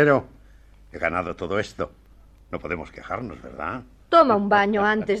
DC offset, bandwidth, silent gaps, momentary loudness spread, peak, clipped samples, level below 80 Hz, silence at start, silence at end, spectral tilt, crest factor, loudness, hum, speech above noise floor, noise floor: under 0.1%; 9.2 kHz; none; 17 LU; -4 dBFS; under 0.1%; -50 dBFS; 0 s; 0 s; -6.5 dB/octave; 20 dB; -23 LUFS; none; 28 dB; -51 dBFS